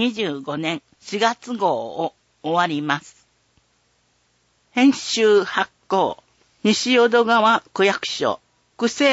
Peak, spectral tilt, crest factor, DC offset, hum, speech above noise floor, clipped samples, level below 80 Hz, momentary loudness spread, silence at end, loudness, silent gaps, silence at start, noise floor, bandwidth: -4 dBFS; -3.5 dB/octave; 18 dB; under 0.1%; none; 45 dB; under 0.1%; -68 dBFS; 12 LU; 0 s; -20 LUFS; none; 0 s; -64 dBFS; 8 kHz